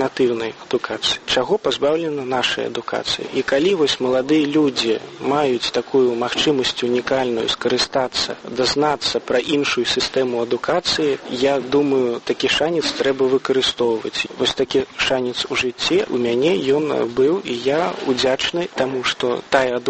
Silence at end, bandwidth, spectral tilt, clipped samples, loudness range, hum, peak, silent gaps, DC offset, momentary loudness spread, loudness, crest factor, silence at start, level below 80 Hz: 0 s; 8.8 kHz; -3.5 dB/octave; under 0.1%; 1 LU; none; -2 dBFS; none; under 0.1%; 4 LU; -19 LUFS; 18 dB; 0 s; -52 dBFS